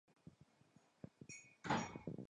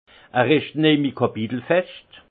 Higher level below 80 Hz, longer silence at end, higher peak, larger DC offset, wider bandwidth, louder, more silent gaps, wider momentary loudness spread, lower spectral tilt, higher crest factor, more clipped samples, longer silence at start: second, -74 dBFS vs -64 dBFS; second, 0.05 s vs 0.3 s; second, -26 dBFS vs -4 dBFS; neither; first, 10.5 kHz vs 4.7 kHz; second, -46 LUFS vs -21 LUFS; neither; first, 23 LU vs 8 LU; second, -5 dB/octave vs -11 dB/octave; first, 24 dB vs 18 dB; neither; about the same, 0.25 s vs 0.35 s